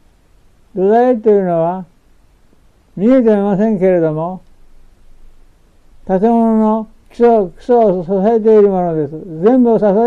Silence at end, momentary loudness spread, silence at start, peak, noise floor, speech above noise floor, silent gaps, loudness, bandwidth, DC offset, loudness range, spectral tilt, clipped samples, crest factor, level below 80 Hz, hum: 0 s; 11 LU; 0.75 s; -2 dBFS; -48 dBFS; 37 dB; none; -13 LUFS; 6.8 kHz; under 0.1%; 4 LU; -10 dB/octave; under 0.1%; 10 dB; -44 dBFS; none